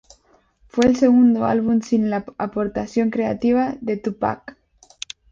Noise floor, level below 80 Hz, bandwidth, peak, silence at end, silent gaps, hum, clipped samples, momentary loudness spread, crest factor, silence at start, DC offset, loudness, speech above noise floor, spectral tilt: -58 dBFS; -52 dBFS; 7.6 kHz; -2 dBFS; 0.8 s; none; none; under 0.1%; 13 LU; 18 dB; 0.75 s; under 0.1%; -20 LUFS; 39 dB; -6.5 dB/octave